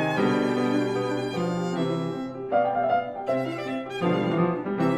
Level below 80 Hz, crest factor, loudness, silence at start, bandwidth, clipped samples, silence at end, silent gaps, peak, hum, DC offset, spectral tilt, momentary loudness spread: -62 dBFS; 16 dB; -26 LUFS; 0 s; 12 kHz; under 0.1%; 0 s; none; -10 dBFS; none; under 0.1%; -7 dB/octave; 6 LU